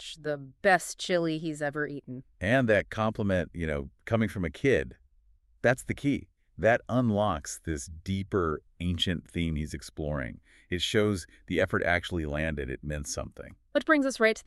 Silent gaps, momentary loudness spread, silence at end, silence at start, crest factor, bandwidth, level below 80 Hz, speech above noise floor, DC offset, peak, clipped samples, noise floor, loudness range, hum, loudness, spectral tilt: none; 11 LU; 0.05 s; 0 s; 22 dB; 13.5 kHz; -46 dBFS; 34 dB; under 0.1%; -8 dBFS; under 0.1%; -63 dBFS; 3 LU; none; -29 LUFS; -5 dB/octave